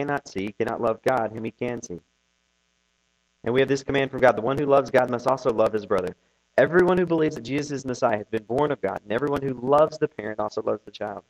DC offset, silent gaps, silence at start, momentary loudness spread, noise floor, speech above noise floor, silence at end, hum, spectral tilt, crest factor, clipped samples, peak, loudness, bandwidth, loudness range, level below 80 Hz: under 0.1%; none; 0 s; 11 LU; -70 dBFS; 47 dB; 0.1 s; none; -6 dB/octave; 20 dB; under 0.1%; -4 dBFS; -24 LUFS; 13.5 kHz; 6 LU; -56 dBFS